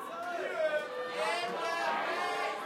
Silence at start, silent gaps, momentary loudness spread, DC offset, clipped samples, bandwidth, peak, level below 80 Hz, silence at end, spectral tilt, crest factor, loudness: 0 s; none; 5 LU; under 0.1%; under 0.1%; 16.5 kHz; -22 dBFS; -86 dBFS; 0 s; -2.5 dB/octave; 14 dB; -34 LUFS